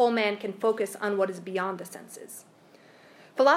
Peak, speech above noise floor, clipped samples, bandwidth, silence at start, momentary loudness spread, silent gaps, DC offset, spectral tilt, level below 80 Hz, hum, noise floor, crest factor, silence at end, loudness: -8 dBFS; 26 dB; under 0.1%; 15.5 kHz; 0 s; 18 LU; none; under 0.1%; -4 dB/octave; -88 dBFS; none; -55 dBFS; 20 dB; 0 s; -29 LUFS